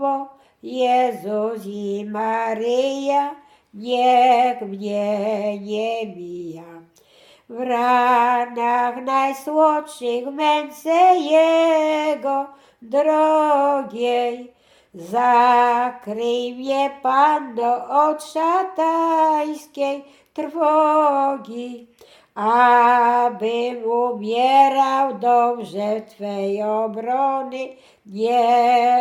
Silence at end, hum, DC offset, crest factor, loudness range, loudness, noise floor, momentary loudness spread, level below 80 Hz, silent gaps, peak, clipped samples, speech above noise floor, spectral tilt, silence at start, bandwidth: 0 s; none; under 0.1%; 16 dB; 4 LU; -19 LUFS; -52 dBFS; 14 LU; -74 dBFS; none; -2 dBFS; under 0.1%; 33 dB; -4.5 dB/octave; 0 s; 14.5 kHz